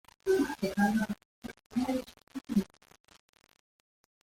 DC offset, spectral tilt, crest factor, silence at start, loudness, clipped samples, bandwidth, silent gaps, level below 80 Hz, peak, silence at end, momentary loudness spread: under 0.1%; -6 dB/octave; 20 dB; 0.25 s; -32 LUFS; under 0.1%; 16.5 kHz; 1.25-1.42 s, 1.66-1.70 s, 2.23-2.27 s; -62 dBFS; -14 dBFS; 1.6 s; 17 LU